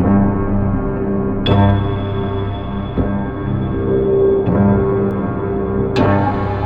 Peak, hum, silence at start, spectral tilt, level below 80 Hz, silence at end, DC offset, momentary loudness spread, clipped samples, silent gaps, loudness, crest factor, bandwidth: 0 dBFS; none; 0 s; -9.5 dB/octave; -28 dBFS; 0 s; under 0.1%; 7 LU; under 0.1%; none; -17 LUFS; 14 dB; 5.2 kHz